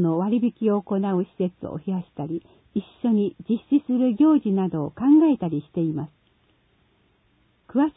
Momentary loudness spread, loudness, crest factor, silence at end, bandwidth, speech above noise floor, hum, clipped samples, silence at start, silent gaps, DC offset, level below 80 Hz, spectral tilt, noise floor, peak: 14 LU; -23 LUFS; 14 dB; 0.05 s; 3.9 kHz; 42 dB; none; under 0.1%; 0 s; none; under 0.1%; -62 dBFS; -13 dB/octave; -64 dBFS; -8 dBFS